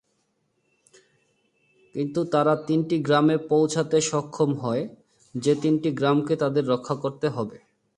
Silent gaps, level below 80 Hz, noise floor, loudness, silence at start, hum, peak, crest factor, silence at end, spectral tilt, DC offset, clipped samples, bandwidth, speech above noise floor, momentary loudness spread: none; -68 dBFS; -72 dBFS; -24 LUFS; 1.95 s; none; -8 dBFS; 18 dB; 0.4 s; -6 dB/octave; under 0.1%; under 0.1%; 11 kHz; 49 dB; 9 LU